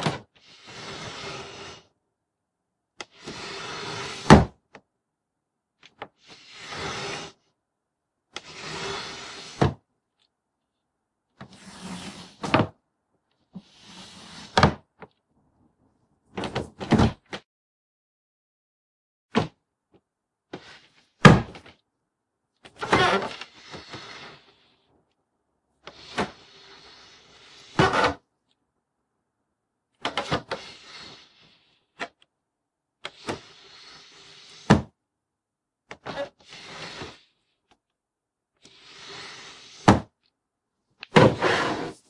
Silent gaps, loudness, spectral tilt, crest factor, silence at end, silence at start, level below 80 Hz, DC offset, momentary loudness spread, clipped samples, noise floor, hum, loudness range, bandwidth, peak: 17.45-19.29 s; -24 LUFS; -5.5 dB/octave; 28 dB; 0.15 s; 0 s; -48 dBFS; under 0.1%; 25 LU; under 0.1%; -85 dBFS; none; 16 LU; 11.5 kHz; 0 dBFS